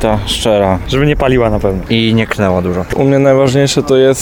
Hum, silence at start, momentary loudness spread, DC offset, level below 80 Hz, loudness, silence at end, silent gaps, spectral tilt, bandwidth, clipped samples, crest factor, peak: none; 0 s; 4 LU; 0.3%; -26 dBFS; -11 LUFS; 0 s; none; -5.5 dB/octave; 17 kHz; under 0.1%; 10 dB; 0 dBFS